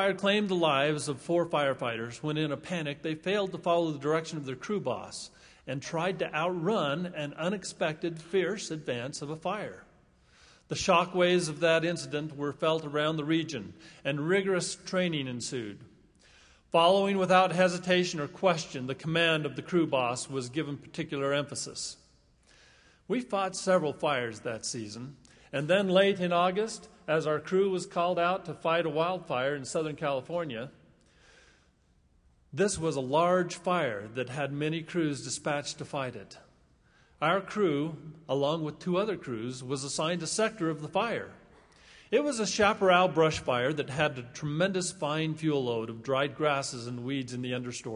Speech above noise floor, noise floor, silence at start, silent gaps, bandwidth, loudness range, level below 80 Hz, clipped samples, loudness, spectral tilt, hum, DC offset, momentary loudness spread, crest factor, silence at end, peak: 36 dB; -66 dBFS; 0 s; none; 11 kHz; 6 LU; -64 dBFS; under 0.1%; -30 LUFS; -4.5 dB/octave; none; under 0.1%; 11 LU; 22 dB; 0 s; -8 dBFS